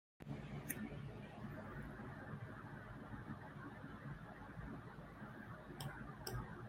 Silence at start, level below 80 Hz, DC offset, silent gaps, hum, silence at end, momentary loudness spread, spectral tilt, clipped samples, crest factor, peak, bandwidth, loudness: 0.2 s; -62 dBFS; under 0.1%; none; none; 0 s; 6 LU; -5.5 dB/octave; under 0.1%; 24 dB; -26 dBFS; 16 kHz; -52 LUFS